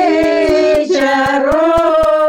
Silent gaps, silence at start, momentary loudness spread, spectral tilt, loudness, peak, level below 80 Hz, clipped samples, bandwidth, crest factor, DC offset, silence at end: none; 0 s; 2 LU; -5 dB/octave; -12 LUFS; -2 dBFS; -36 dBFS; under 0.1%; 15 kHz; 8 dB; under 0.1%; 0 s